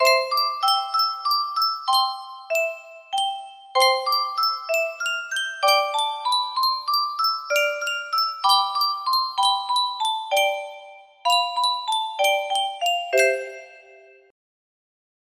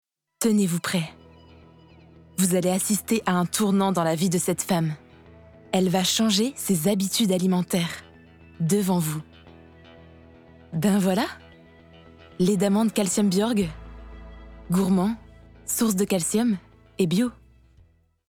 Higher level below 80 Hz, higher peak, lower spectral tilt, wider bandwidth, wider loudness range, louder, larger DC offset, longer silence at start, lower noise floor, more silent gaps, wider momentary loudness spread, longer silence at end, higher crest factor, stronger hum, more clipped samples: second, -78 dBFS vs -52 dBFS; first, -4 dBFS vs -8 dBFS; second, 2 dB/octave vs -5 dB/octave; second, 15.5 kHz vs 18.5 kHz; about the same, 2 LU vs 4 LU; about the same, -22 LUFS vs -24 LUFS; neither; second, 0 s vs 0.4 s; second, -50 dBFS vs -58 dBFS; neither; second, 8 LU vs 13 LU; first, 1.5 s vs 0.95 s; about the same, 18 dB vs 18 dB; neither; neither